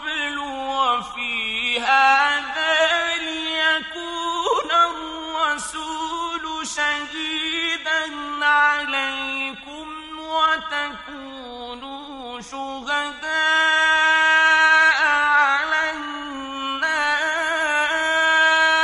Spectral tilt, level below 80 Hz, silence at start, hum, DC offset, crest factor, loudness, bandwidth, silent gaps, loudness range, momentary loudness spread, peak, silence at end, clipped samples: -0.5 dB/octave; -56 dBFS; 0 s; none; under 0.1%; 16 dB; -19 LUFS; 11.5 kHz; none; 9 LU; 17 LU; -4 dBFS; 0 s; under 0.1%